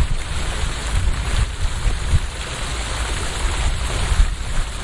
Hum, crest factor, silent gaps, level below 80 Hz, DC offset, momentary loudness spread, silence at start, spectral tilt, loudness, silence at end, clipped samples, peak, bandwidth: none; 16 dB; none; -22 dBFS; under 0.1%; 4 LU; 0 s; -3.5 dB/octave; -23 LUFS; 0 s; under 0.1%; -4 dBFS; 11.5 kHz